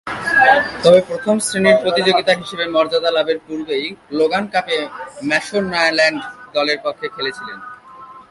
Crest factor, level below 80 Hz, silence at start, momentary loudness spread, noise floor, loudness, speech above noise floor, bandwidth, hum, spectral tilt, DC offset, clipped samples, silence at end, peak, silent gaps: 18 dB; -56 dBFS; 0.05 s; 12 LU; -39 dBFS; -16 LUFS; 22 dB; 11.5 kHz; none; -3.5 dB/octave; under 0.1%; under 0.1%; 0.1 s; 0 dBFS; none